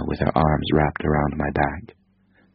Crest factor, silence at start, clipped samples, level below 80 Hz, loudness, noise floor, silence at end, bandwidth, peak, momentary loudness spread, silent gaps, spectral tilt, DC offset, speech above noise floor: 20 dB; 0 s; under 0.1%; -34 dBFS; -22 LUFS; -60 dBFS; 0.7 s; 5.4 kHz; -2 dBFS; 5 LU; none; -6 dB/octave; under 0.1%; 39 dB